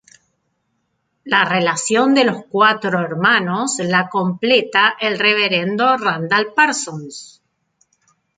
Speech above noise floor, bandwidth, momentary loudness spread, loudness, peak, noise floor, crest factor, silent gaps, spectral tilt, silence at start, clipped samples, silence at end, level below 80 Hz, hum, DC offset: 53 dB; 9.6 kHz; 6 LU; -16 LUFS; -2 dBFS; -69 dBFS; 16 dB; none; -3.5 dB/octave; 1.25 s; under 0.1%; 1.1 s; -66 dBFS; none; under 0.1%